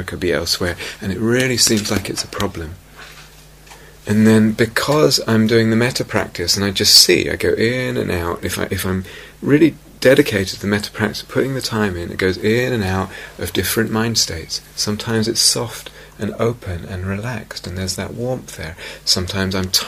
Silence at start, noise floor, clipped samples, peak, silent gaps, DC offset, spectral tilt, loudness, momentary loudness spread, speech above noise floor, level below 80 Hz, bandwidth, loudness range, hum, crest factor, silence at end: 0 s; -42 dBFS; under 0.1%; 0 dBFS; none; under 0.1%; -3.5 dB/octave; -17 LUFS; 14 LU; 25 dB; -42 dBFS; 15.5 kHz; 7 LU; none; 18 dB; 0 s